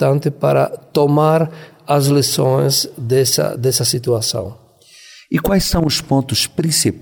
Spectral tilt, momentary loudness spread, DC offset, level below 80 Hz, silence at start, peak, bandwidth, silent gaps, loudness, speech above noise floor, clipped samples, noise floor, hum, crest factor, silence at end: -4.5 dB/octave; 6 LU; under 0.1%; -38 dBFS; 0 s; -2 dBFS; 19.5 kHz; none; -16 LUFS; 29 dB; under 0.1%; -44 dBFS; none; 14 dB; 0 s